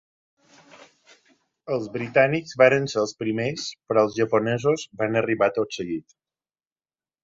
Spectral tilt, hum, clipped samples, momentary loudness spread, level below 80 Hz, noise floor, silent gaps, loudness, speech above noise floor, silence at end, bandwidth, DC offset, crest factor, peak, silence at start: -5.5 dB/octave; none; under 0.1%; 12 LU; -64 dBFS; under -90 dBFS; none; -23 LUFS; over 67 dB; 1.25 s; 7.8 kHz; under 0.1%; 22 dB; -2 dBFS; 1.65 s